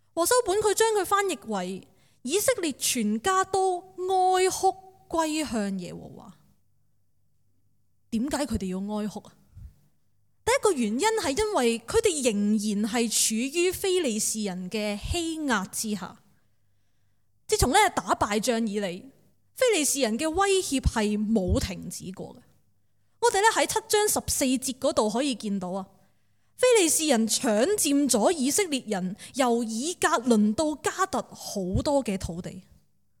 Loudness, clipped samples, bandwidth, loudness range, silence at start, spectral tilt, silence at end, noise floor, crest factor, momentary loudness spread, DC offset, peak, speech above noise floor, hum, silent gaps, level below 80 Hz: -25 LUFS; under 0.1%; 18 kHz; 8 LU; 0.15 s; -3.5 dB/octave; 0.6 s; -73 dBFS; 18 dB; 11 LU; under 0.1%; -8 dBFS; 47 dB; none; none; -46 dBFS